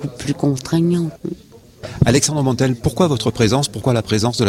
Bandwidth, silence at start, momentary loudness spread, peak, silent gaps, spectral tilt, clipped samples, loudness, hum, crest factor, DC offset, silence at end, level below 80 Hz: 16 kHz; 0 s; 15 LU; -2 dBFS; none; -5.5 dB/octave; under 0.1%; -17 LUFS; none; 16 dB; under 0.1%; 0 s; -40 dBFS